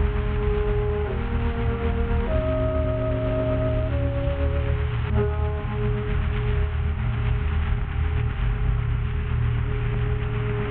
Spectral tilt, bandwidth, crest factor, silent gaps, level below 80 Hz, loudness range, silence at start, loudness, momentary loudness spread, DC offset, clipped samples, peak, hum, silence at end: -12 dB/octave; 4.1 kHz; 14 dB; none; -26 dBFS; 1 LU; 0 s; -25 LUFS; 2 LU; under 0.1%; under 0.1%; -10 dBFS; none; 0 s